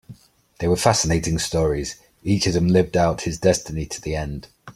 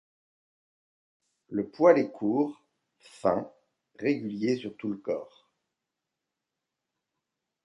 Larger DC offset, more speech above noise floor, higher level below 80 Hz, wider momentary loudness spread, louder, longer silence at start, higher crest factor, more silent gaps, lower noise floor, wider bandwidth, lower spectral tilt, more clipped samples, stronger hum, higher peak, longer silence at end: neither; second, 26 dB vs 59 dB; first, -38 dBFS vs -72 dBFS; second, 11 LU vs 14 LU; first, -21 LUFS vs -28 LUFS; second, 0.1 s vs 1.5 s; about the same, 20 dB vs 24 dB; neither; second, -47 dBFS vs -87 dBFS; first, 15.5 kHz vs 11 kHz; second, -5 dB/octave vs -7.5 dB/octave; neither; neither; first, -2 dBFS vs -8 dBFS; second, 0.05 s vs 2.4 s